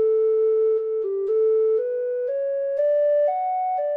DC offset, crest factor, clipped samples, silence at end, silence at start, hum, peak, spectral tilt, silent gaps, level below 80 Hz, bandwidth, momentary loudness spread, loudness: under 0.1%; 6 dB; under 0.1%; 0 s; 0 s; none; -14 dBFS; -6 dB/octave; none; -78 dBFS; 3.1 kHz; 6 LU; -22 LUFS